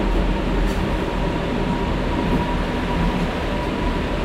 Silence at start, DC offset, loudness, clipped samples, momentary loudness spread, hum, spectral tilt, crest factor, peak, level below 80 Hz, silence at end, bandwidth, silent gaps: 0 s; under 0.1%; -22 LUFS; under 0.1%; 2 LU; none; -6.5 dB/octave; 12 dB; -8 dBFS; -24 dBFS; 0 s; 12 kHz; none